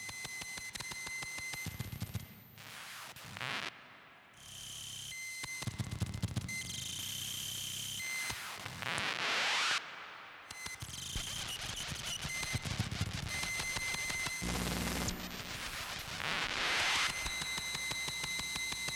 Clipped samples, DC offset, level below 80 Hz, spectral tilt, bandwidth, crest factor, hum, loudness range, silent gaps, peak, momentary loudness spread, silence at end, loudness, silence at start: under 0.1%; under 0.1%; -54 dBFS; -2 dB/octave; over 20 kHz; 22 dB; none; 8 LU; none; -18 dBFS; 14 LU; 0 s; -37 LUFS; 0 s